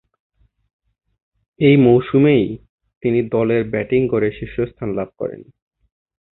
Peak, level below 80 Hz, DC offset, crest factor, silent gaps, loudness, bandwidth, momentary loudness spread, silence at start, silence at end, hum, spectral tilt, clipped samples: -2 dBFS; -48 dBFS; under 0.1%; 18 dB; 2.69-2.78 s, 2.97-3.01 s; -17 LUFS; 4.1 kHz; 13 LU; 1.6 s; 0.9 s; none; -12.5 dB/octave; under 0.1%